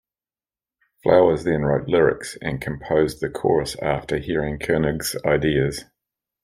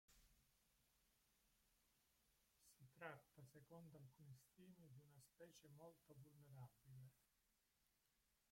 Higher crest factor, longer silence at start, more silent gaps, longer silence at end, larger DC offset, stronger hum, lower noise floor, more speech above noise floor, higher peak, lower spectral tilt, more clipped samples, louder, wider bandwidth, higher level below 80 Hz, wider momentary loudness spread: second, 20 dB vs 26 dB; first, 1.05 s vs 0.1 s; neither; first, 0.6 s vs 0 s; neither; neither; about the same, under -90 dBFS vs -87 dBFS; first, over 69 dB vs 20 dB; first, -2 dBFS vs -42 dBFS; about the same, -6 dB/octave vs -5.5 dB/octave; neither; first, -21 LUFS vs -66 LUFS; about the same, 16 kHz vs 16.5 kHz; first, -44 dBFS vs -88 dBFS; about the same, 10 LU vs 9 LU